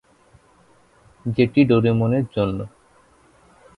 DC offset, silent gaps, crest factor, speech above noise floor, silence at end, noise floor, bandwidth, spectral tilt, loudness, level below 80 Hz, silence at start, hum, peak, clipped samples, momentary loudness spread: under 0.1%; none; 18 dB; 37 dB; 1.1 s; -55 dBFS; 10.5 kHz; -9.5 dB/octave; -20 LUFS; -50 dBFS; 1.25 s; none; -4 dBFS; under 0.1%; 16 LU